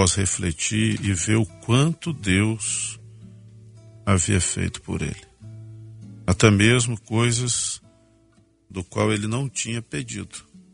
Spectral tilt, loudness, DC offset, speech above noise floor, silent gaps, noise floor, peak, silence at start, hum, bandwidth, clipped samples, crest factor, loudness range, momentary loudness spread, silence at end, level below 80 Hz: -4 dB/octave; -22 LUFS; under 0.1%; 37 dB; none; -59 dBFS; 0 dBFS; 0 s; none; 11 kHz; under 0.1%; 24 dB; 5 LU; 21 LU; 0.15 s; -46 dBFS